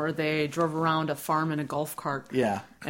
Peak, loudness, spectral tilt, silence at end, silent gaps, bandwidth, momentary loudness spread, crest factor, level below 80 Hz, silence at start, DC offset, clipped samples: -12 dBFS; -28 LUFS; -5.5 dB/octave; 0 s; none; 16.5 kHz; 5 LU; 16 dB; -64 dBFS; 0 s; under 0.1%; under 0.1%